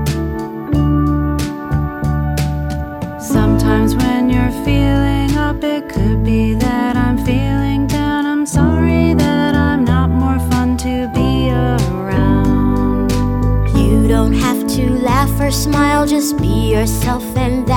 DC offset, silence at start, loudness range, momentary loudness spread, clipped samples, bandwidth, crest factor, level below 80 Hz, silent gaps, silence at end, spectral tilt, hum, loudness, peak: under 0.1%; 0 s; 2 LU; 6 LU; under 0.1%; 19.5 kHz; 14 dB; -22 dBFS; none; 0 s; -6.5 dB/octave; none; -15 LUFS; 0 dBFS